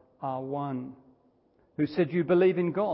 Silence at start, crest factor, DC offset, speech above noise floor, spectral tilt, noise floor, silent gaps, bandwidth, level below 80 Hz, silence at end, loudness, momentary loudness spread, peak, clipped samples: 0.2 s; 16 dB; under 0.1%; 39 dB; -11.5 dB/octave; -66 dBFS; none; 5.8 kHz; -70 dBFS; 0 s; -28 LUFS; 15 LU; -14 dBFS; under 0.1%